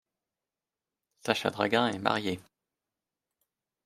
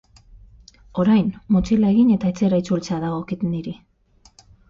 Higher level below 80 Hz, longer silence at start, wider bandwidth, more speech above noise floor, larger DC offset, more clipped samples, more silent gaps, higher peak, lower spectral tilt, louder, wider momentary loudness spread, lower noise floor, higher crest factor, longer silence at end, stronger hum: second, -74 dBFS vs -44 dBFS; first, 1.25 s vs 0.35 s; first, 15 kHz vs 7.6 kHz; first, over 61 dB vs 37 dB; neither; neither; neither; about the same, -8 dBFS vs -8 dBFS; second, -4.5 dB/octave vs -8 dB/octave; second, -29 LUFS vs -20 LUFS; about the same, 12 LU vs 13 LU; first, under -90 dBFS vs -56 dBFS; first, 26 dB vs 14 dB; first, 1.45 s vs 0.95 s; neither